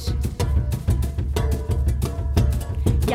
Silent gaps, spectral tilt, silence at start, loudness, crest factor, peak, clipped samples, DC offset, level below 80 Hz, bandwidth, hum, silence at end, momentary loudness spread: none; -6.5 dB/octave; 0 s; -23 LUFS; 14 dB; -8 dBFS; under 0.1%; under 0.1%; -24 dBFS; 16 kHz; none; 0 s; 3 LU